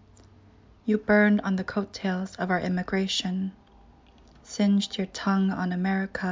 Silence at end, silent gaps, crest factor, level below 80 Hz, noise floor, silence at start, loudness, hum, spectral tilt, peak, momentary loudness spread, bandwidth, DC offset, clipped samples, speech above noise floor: 0 s; none; 16 dB; -56 dBFS; -55 dBFS; 0.85 s; -26 LUFS; none; -5.5 dB/octave; -10 dBFS; 10 LU; 7.6 kHz; under 0.1%; under 0.1%; 29 dB